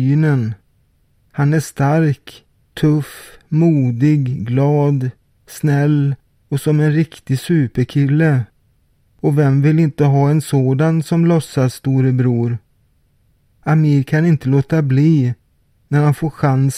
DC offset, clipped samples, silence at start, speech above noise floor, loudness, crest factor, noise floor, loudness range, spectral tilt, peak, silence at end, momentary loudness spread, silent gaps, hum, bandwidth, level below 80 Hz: under 0.1%; under 0.1%; 0 s; 43 dB; -16 LUFS; 14 dB; -58 dBFS; 2 LU; -8 dB/octave; -2 dBFS; 0 s; 8 LU; none; none; 14.5 kHz; -50 dBFS